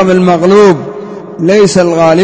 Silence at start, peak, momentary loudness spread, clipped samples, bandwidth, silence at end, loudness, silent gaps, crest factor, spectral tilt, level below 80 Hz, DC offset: 0 s; 0 dBFS; 17 LU; 2%; 8 kHz; 0 s; -7 LUFS; none; 8 dB; -6 dB/octave; -44 dBFS; under 0.1%